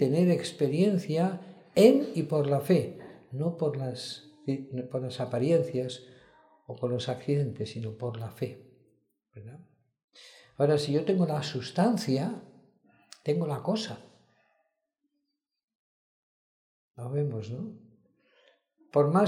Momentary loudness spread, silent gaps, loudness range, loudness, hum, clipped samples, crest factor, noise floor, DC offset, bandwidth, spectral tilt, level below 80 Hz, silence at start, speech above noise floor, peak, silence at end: 17 LU; 10.04-10.08 s, 15.64-15.68 s, 15.75-16.94 s; 13 LU; -29 LUFS; none; under 0.1%; 24 dB; -82 dBFS; under 0.1%; 15.5 kHz; -7 dB/octave; -74 dBFS; 0 s; 55 dB; -6 dBFS; 0 s